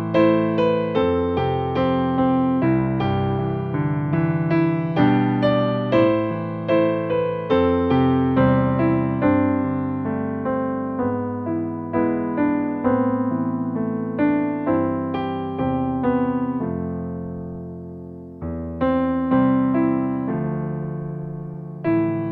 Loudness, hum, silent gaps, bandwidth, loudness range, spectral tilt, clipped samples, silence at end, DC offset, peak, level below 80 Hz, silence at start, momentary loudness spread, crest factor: -21 LUFS; none; none; 5.2 kHz; 4 LU; -10.5 dB/octave; under 0.1%; 0 s; under 0.1%; -4 dBFS; -46 dBFS; 0 s; 11 LU; 16 dB